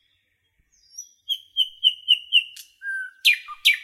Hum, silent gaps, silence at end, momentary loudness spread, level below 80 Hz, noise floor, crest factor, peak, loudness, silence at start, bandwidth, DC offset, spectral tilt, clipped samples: none; none; 0 s; 20 LU; -74 dBFS; -69 dBFS; 20 dB; -6 dBFS; -20 LUFS; 0.95 s; 16.5 kHz; under 0.1%; 7 dB/octave; under 0.1%